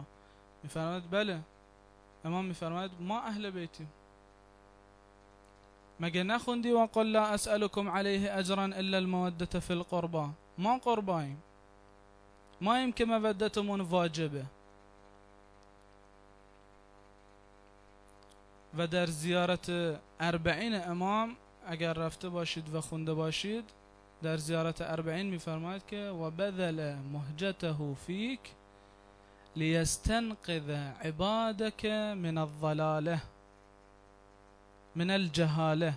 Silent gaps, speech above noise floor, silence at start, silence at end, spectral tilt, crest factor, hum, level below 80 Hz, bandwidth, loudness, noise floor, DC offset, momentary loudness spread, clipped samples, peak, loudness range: none; 27 dB; 0 s; 0 s; -5.5 dB/octave; 18 dB; 50 Hz at -60 dBFS; -56 dBFS; 11 kHz; -34 LUFS; -60 dBFS; under 0.1%; 10 LU; under 0.1%; -16 dBFS; 8 LU